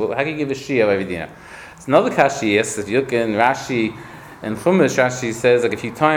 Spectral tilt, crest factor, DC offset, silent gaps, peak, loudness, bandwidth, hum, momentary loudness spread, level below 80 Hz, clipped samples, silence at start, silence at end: -5 dB/octave; 18 dB; under 0.1%; none; 0 dBFS; -18 LUFS; 17.5 kHz; none; 16 LU; -54 dBFS; under 0.1%; 0 s; 0 s